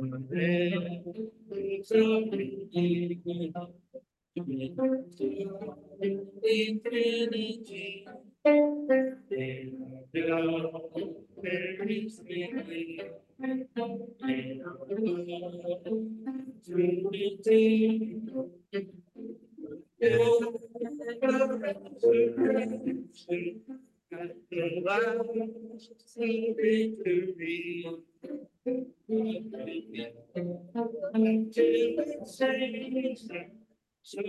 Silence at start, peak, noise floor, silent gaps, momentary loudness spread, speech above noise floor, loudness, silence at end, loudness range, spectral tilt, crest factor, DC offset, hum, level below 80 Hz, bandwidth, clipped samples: 0 s; -12 dBFS; -52 dBFS; none; 17 LU; 23 dB; -31 LUFS; 0 s; 7 LU; -7 dB/octave; 18 dB; under 0.1%; none; -76 dBFS; 11.5 kHz; under 0.1%